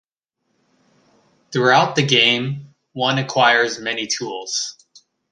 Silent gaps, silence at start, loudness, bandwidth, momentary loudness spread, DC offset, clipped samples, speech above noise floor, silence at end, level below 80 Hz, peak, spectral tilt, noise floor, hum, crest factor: none; 1.5 s; -18 LUFS; 10.5 kHz; 13 LU; under 0.1%; under 0.1%; 56 dB; 0.6 s; -66 dBFS; -2 dBFS; -3 dB/octave; -74 dBFS; none; 20 dB